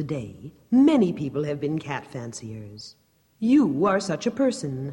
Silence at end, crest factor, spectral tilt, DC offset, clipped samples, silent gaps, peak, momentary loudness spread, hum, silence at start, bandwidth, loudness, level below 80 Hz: 0 s; 16 dB; -6.5 dB/octave; under 0.1%; under 0.1%; none; -8 dBFS; 20 LU; none; 0 s; 11 kHz; -23 LUFS; -60 dBFS